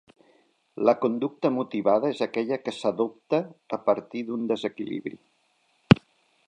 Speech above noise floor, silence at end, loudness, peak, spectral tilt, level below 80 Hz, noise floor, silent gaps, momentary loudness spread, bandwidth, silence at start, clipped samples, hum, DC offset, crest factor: 42 dB; 0.5 s; -26 LUFS; 0 dBFS; -7.5 dB/octave; -56 dBFS; -68 dBFS; none; 12 LU; 10 kHz; 0.75 s; under 0.1%; none; under 0.1%; 26 dB